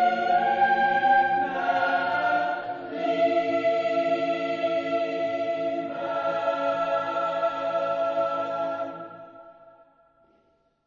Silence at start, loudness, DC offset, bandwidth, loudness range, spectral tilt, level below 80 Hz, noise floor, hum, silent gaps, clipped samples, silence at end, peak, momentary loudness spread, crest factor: 0 s; -25 LUFS; under 0.1%; 7.2 kHz; 5 LU; -5.5 dB/octave; -72 dBFS; -66 dBFS; none; none; under 0.1%; 1.15 s; -10 dBFS; 9 LU; 16 dB